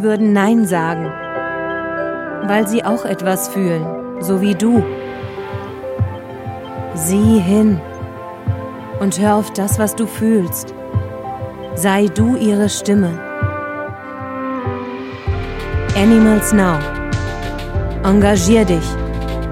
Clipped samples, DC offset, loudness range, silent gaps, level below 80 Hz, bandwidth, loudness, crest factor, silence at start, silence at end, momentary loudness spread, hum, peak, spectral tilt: under 0.1%; under 0.1%; 4 LU; none; -32 dBFS; 16 kHz; -17 LUFS; 16 dB; 0 s; 0 s; 14 LU; none; 0 dBFS; -6 dB/octave